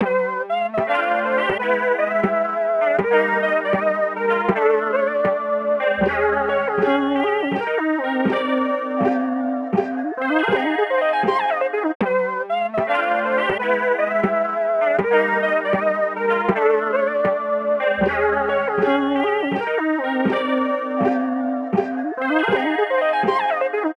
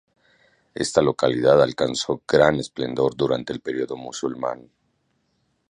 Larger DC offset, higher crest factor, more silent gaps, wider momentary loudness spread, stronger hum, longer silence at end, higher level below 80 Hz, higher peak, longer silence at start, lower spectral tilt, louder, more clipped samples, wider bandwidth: neither; second, 14 dB vs 22 dB; first, 11.95-12.00 s vs none; second, 4 LU vs 12 LU; neither; second, 0.05 s vs 1.15 s; about the same, -54 dBFS vs -54 dBFS; about the same, -4 dBFS vs -2 dBFS; second, 0 s vs 0.75 s; first, -7 dB/octave vs -5 dB/octave; about the same, -20 LUFS vs -22 LUFS; neither; about the same, 11 kHz vs 11 kHz